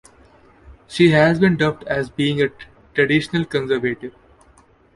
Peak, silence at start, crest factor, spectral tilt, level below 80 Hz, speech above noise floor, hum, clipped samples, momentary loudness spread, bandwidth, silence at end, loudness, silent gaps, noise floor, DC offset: -2 dBFS; 0.7 s; 18 dB; -6.5 dB/octave; -50 dBFS; 35 dB; none; under 0.1%; 12 LU; 11.5 kHz; 0.85 s; -18 LUFS; none; -53 dBFS; under 0.1%